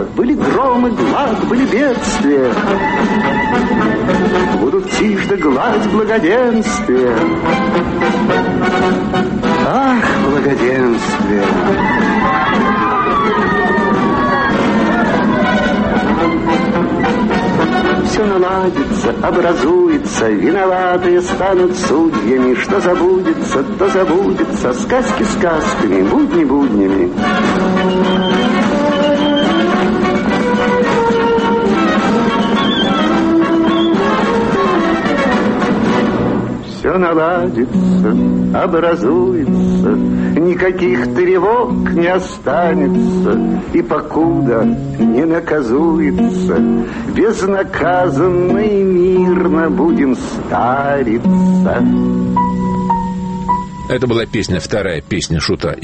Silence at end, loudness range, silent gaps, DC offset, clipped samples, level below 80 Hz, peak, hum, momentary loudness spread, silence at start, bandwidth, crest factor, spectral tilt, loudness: 0 s; 1 LU; none; under 0.1%; under 0.1%; -36 dBFS; -2 dBFS; none; 3 LU; 0 s; 8.8 kHz; 12 dB; -6 dB/octave; -13 LUFS